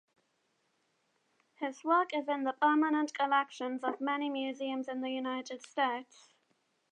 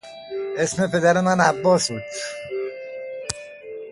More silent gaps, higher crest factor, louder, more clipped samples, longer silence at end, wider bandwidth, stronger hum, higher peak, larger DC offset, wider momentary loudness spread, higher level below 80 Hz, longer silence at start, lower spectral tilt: neither; about the same, 20 dB vs 20 dB; second, -33 LUFS vs -22 LUFS; neither; first, 0.9 s vs 0 s; second, 9.6 kHz vs 11.5 kHz; neither; second, -16 dBFS vs -2 dBFS; neither; second, 10 LU vs 16 LU; second, under -90 dBFS vs -58 dBFS; first, 1.6 s vs 0.05 s; second, -3 dB/octave vs -4.5 dB/octave